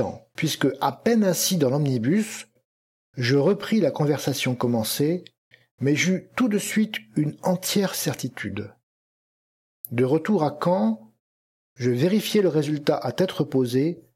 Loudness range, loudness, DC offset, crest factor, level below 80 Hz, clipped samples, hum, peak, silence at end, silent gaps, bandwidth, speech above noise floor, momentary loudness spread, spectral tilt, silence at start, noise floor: 4 LU; -23 LUFS; under 0.1%; 18 dB; -68 dBFS; under 0.1%; none; -6 dBFS; 0.15 s; 2.65-3.13 s, 5.38-5.51 s, 5.71-5.78 s, 8.83-9.84 s, 11.20-11.76 s; 16.5 kHz; over 67 dB; 10 LU; -5 dB/octave; 0 s; under -90 dBFS